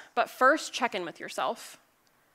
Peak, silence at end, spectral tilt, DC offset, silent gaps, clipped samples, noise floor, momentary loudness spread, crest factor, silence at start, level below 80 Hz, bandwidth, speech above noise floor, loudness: -10 dBFS; 0.6 s; -2 dB/octave; under 0.1%; none; under 0.1%; -67 dBFS; 15 LU; 20 dB; 0 s; -82 dBFS; 16 kHz; 38 dB; -28 LUFS